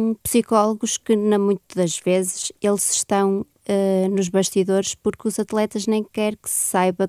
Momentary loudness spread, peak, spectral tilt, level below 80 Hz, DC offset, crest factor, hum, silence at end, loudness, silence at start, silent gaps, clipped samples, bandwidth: 6 LU; -4 dBFS; -4.5 dB/octave; -58 dBFS; under 0.1%; 18 dB; none; 0 s; -21 LUFS; 0 s; none; under 0.1%; 15.5 kHz